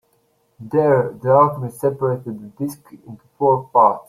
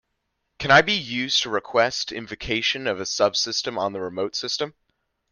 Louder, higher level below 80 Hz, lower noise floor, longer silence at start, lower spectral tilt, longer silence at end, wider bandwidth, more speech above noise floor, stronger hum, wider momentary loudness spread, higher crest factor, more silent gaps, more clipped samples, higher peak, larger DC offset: first, -18 LUFS vs -22 LUFS; second, -60 dBFS vs -54 dBFS; second, -63 dBFS vs -76 dBFS; about the same, 0.6 s vs 0.6 s; first, -8.5 dB/octave vs -2.5 dB/octave; second, 0.05 s vs 0.6 s; first, 15 kHz vs 10.5 kHz; second, 45 dB vs 53 dB; neither; about the same, 14 LU vs 12 LU; about the same, 18 dB vs 22 dB; neither; neither; about the same, -2 dBFS vs -2 dBFS; neither